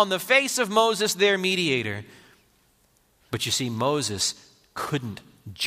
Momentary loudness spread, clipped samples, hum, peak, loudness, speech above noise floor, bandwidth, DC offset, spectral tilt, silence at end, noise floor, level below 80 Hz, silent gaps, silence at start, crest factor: 18 LU; under 0.1%; none; -6 dBFS; -23 LUFS; 40 dB; 15.5 kHz; under 0.1%; -3 dB/octave; 0 s; -64 dBFS; -66 dBFS; none; 0 s; 20 dB